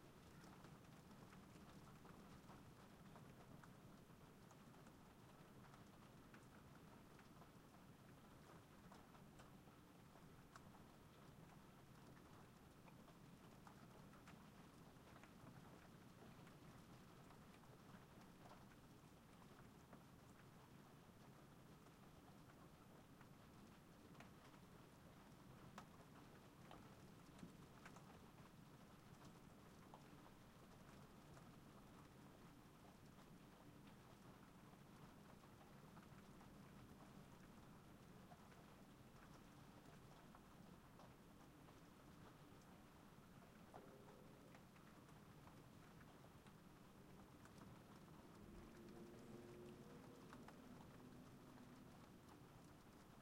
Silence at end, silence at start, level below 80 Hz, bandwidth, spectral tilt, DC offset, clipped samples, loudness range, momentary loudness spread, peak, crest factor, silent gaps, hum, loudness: 0 s; 0 s; -76 dBFS; 16 kHz; -5.5 dB/octave; under 0.1%; under 0.1%; 3 LU; 3 LU; -44 dBFS; 20 dB; none; none; -65 LUFS